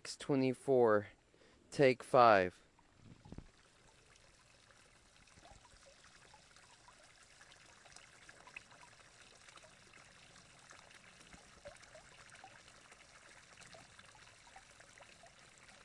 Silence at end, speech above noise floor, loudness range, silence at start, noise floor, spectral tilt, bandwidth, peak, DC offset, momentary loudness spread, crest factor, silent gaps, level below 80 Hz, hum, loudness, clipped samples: 4.15 s; 36 dB; 27 LU; 0.05 s; -67 dBFS; -5.5 dB/octave; 11.5 kHz; -14 dBFS; under 0.1%; 29 LU; 26 dB; none; -74 dBFS; none; -32 LUFS; under 0.1%